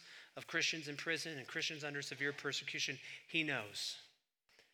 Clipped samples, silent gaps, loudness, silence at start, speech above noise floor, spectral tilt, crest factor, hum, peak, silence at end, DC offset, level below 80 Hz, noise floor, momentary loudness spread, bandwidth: under 0.1%; none; -40 LUFS; 0 s; 33 dB; -2 dB/octave; 22 dB; none; -22 dBFS; 0.1 s; under 0.1%; under -90 dBFS; -75 dBFS; 8 LU; 19 kHz